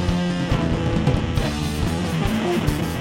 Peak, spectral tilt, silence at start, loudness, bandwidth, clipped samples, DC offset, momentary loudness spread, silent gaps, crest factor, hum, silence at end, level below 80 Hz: -6 dBFS; -6 dB/octave; 0 s; -22 LUFS; 16.5 kHz; under 0.1%; under 0.1%; 3 LU; none; 16 dB; none; 0 s; -30 dBFS